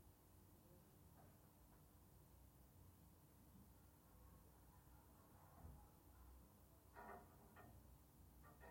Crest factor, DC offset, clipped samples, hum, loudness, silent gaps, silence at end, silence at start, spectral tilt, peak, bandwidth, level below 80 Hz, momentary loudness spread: 20 dB; under 0.1%; under 0.1%; none; -68 LUFS; none; 0 s; 0 s; -5.5 dB/octave; -46 dBFS; 16.5 kHz; -72 dBFS; 6 LU